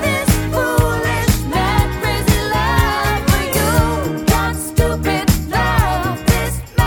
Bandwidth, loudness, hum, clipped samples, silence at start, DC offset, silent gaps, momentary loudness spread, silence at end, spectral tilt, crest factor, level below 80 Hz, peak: 19 kHz; -16 LUFS; none; under 0.1%; 0 s; under 0.1%; none; 3 LU; 0 s; -5 dB/octave; 14 dB; -22 dBFS; -2 dBFS